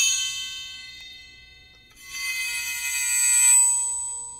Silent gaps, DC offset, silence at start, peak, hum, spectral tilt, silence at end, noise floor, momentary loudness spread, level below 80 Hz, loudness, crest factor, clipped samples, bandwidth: none; under 0.1%; 0 s; -8 dBFS; 60 Hz at -65 dBFS; 4.5 dB/octave; 0 s; -51 dBFS; 23 LU; -60 dBFS; -20 LUFS; 16 dB; under 0.1%; 16 kHz